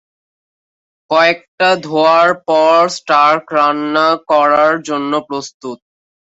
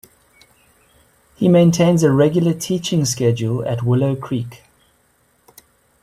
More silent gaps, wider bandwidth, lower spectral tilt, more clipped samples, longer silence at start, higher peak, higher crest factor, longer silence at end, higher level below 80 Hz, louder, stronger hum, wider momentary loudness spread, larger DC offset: first, 1.48-1.58 s, 5.54-5.60 s vs none; second, 8 kHz vs 14.5 kHz; second, -4 dB/octave vs -6.5 dB/octave; neither; second, 1.1 s vs 1.4 s; about the same, -2 dBFS vs -2 dBFS; about the same, 12 dB vs 16 dB; second, 0.55 s vs 1.45 s; second, -64 dBFS vs -54 dBFS; first, -12 LUFS vs -17 LUFS; neither; about the same, 10 LU vs 10 LU; neither